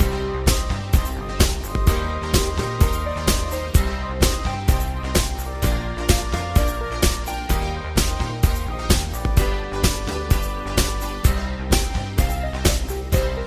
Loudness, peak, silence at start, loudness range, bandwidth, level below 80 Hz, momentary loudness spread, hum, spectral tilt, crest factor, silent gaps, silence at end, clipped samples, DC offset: -22 LUFS; 0 dBFS; 0 s; 1 LU; 16 kHz; -22 dBFS; 3 LU; none; -4.5 dB/octave; 20 dB; none; 0 s; under 0.1%; under 0.1%